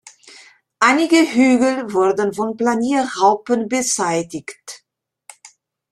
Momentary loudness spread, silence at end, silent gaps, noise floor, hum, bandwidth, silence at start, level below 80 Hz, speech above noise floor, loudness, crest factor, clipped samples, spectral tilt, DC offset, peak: 15 LU; 0.45 s; none; -71 dBFS; none; 13.5 kHz; 0.8 s; -64 dBFS; 55 dB; -17 LUFS; 18 dB; under 0.1%; -3.5 dB/octave; under 0.1%; -2 dBFS